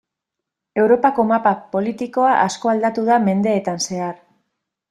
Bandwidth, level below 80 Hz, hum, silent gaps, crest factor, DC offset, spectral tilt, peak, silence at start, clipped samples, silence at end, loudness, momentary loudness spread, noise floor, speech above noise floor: 12 kHz; -62 dBFS; none; none; 16 dB; under 0.1%; -5 dB/octave; -2 dBFS; 0.75 s; under 0.1%; 0.75 s; -18 LUFS; 8 LU; -82 dBFS; 65 dB